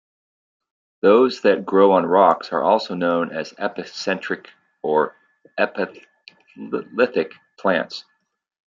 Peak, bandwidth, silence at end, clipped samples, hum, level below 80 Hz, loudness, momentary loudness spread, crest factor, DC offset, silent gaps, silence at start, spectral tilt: -2 dBFS; 7.6 kHz; 0.75 s; under 0.1%; none; -72 dBFS; -20 LUFS; 14 LU; 18 dB; under 0.1%; none; 1.05 s; -6 dB/octave